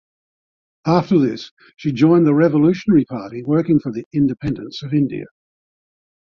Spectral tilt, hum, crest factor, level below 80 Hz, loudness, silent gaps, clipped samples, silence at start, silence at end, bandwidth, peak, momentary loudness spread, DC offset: -8.5 dB/octave; none; 16 dB; -52 dBFS; -18 LUFS; 1.51-1.57 s, 4.06-4.11 s; under 0.1%; 0.85 s; 1.05 s; 6.8 kHz; -2 dBFS; 13 LU; under 0.1%